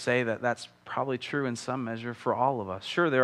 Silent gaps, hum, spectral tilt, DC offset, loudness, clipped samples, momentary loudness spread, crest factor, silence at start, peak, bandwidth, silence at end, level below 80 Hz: none; none; -5.5 dB/octave; under 0.1%; -30 LUFS; under 0.1%; 7 LU; 18 dB; 0 s; -10 dBFS; 12.5 kHz; 0 s; -76 dBFS